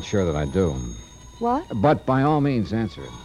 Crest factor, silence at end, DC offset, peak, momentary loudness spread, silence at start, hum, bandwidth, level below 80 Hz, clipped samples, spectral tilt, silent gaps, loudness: 16 dB; 0 s; under 0.1%; -6 dBFS; 11 LU; 0 s; none; 11 kHz; -40 dBFS; under 0.1%; -7 dB/octave; none; -23 LUFS